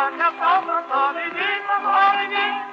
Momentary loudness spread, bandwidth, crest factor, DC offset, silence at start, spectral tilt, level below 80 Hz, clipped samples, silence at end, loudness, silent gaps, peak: 6 LU; 7 kHz; 14 dB; under 0.1%; 0 s; -3 dB/octave; -88 dBFS; under 0.1%; 0 s; -20 LUFS; none; -6 dBFS